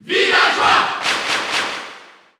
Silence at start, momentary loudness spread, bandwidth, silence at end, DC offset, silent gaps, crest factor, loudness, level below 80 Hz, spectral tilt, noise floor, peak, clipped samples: 0.05 s; 13 LU; over 20 kHz; 0.35 s; under 0.1%; none; 16 dB; -15 LUFS; -58 dBFS; -1 dB/octave; -41 dBFS; -2 dBFS; under 0.1%